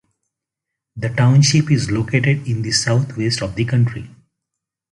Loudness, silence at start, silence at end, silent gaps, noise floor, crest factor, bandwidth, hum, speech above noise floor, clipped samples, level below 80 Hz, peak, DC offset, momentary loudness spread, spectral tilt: -17 LUFS; 0.95 s; 0.85 s; none; -82 dBFS; 16 dB; 11.5 kHz; none; 66 dB; under 0.1%; -46 dBFS; -2 dBFS; under 0.1%; 8 LU; -5 dB/octave